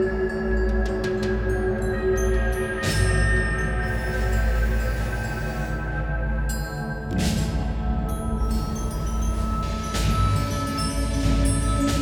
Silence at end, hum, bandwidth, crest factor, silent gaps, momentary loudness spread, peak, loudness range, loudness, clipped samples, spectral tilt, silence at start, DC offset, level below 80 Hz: 0 s; none; 17.5 kHz; 16 dB; none; 6 LU; -8 dBFS; 3 LU; -25 LUFS; under 0.1%; -5.5 dB/octave; 0 s; under 0.1%; -26 dBFS